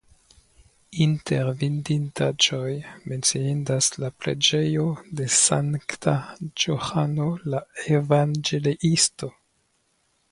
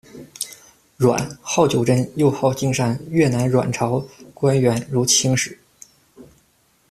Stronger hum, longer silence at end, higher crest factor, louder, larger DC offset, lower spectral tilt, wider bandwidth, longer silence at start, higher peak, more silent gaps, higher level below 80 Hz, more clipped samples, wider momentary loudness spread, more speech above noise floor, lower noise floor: neither; first, 1 s vs 0.65 s; about the same, 22 dB vs 18 dB; second, -23 LUFS vs -19 LUFS; neither; about the same, -4 dB/octave vs -5 dB/octave; second, 11.5 kHz vs 14.5 kHz; first, 0.9 s vs 0.15 s; about the same, -4 dBFS vs -4 dBFS; neither; second, -58 dBFS vs -52 dBFS; neither; second, 10 LU vs 14 LU; about the same, 45 dB vs 42 dB; first, -69 dBFS vs -60 dBFS